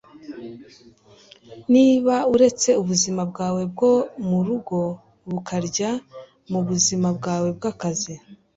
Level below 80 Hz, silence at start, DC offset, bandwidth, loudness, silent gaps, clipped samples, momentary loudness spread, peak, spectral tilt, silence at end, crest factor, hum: -58 dBFS; 0.15 s; under 0.1%; 8 kHz; -21 LUFS; none; under 0.1%; 19 LU; -4 dBFS; -5 dB/octave; 0.2 s; 18 dB; none